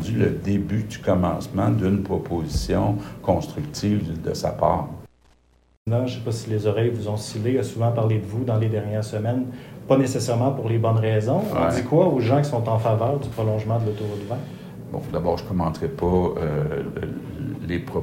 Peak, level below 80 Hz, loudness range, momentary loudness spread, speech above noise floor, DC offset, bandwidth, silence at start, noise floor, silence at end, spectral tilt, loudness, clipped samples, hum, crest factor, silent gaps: -4 dBFS; -42 dBFS; 5 LU; 10 LU; 36 dB; under 0.1%; 16 kHz; 0 s; -58 dBFS; 0 s; -7.5 dB/octave; -23 LUFS; under 0.1%; none; 18 dB; 5.77-5.85 s